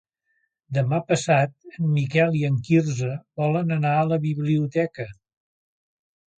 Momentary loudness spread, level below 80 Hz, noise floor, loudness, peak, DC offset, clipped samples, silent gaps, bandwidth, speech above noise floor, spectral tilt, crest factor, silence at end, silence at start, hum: 8 LU; -62 dBFS; -73 dBFS; -23 LUFS; -6 dBFS; under 0.1%; under 0.1%; none; 9.2 kHz; 51 dB; -7 dB/octave; 18 dB; 1.25 s; 0.7 s; none